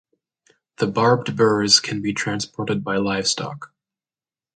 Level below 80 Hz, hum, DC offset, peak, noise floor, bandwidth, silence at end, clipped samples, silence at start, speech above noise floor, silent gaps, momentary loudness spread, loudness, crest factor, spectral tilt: -58 dBFS; none; under 0.1%; -2 dBFS; under -90 dBFS; 9.4 kHz; 0.9 s; under 0.1%; 0.8 s; over 70 dB; none; 11 LU; -20 LUFS; 22 dB; -3.5 dB/octave